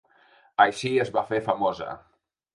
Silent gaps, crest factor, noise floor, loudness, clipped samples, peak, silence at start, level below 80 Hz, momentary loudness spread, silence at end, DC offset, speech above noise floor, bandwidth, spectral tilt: none; 22 dB; -59 dBFS; -25 LUFS; under 0.1%; -4 dBFS; 0.6 s; -64 dBFS; 15 LU; 0.55 s; under 0.1%; 35 dB; 11.5 kHz; -5 dB/octave